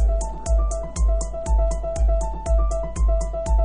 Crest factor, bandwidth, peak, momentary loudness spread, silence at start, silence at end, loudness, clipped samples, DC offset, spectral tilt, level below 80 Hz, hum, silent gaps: 10 dB; 10 kHz; -10 dBFS; 3 LU; 0 s; 0 s; -24 LUFS; under 0.1%; under 0.1%; -6.5 dB/octave; -20 dBFS; none; none